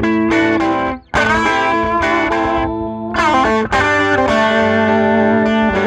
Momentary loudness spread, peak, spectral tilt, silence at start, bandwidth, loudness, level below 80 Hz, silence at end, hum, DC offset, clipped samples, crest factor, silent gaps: 5 LU; -2 dBFS; -5.5 dB/octave; 0 s; 10.5 kHz; -14 LUFS; -36 dBFS; 0 s; none; under 0.1%; under 0.1%; 12 dB; none